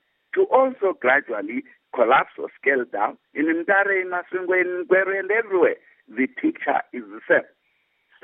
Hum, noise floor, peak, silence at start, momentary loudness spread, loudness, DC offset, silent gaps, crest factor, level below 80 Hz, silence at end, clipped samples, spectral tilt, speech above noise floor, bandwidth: none; -68 dBFS; -4 dBFS; 0.35 s; 11 LU; -21 LUFS; under 0.1%; none; 18 dB; -74 dBFS; 0.8 s; under 0.1%; -9 dB/octave; 46 dB; 3.8 kHz